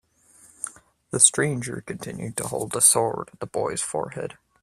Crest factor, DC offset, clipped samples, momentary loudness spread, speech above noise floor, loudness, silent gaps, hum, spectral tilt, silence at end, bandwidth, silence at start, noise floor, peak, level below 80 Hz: 26 dB; under 0.1%; under 0.1%; 18 LU; 31 dB; -22 LUFS; none; none; -2.5 dB/octave; 0.3 s; 15.5 kHz; 0.6 s; -55 dBFS; 0 dBFS; -60 dBFS